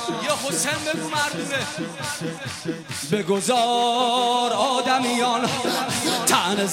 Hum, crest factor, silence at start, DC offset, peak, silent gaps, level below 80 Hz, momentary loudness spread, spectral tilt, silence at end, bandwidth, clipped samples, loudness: none; 20 dB; 0 s; under 0.1%; -2 dBFS; none; -64 dBFS; 10 LU; -2.5 dB/octave; 0 s; 16.5 kHz; under 0.1%; -22 LUFS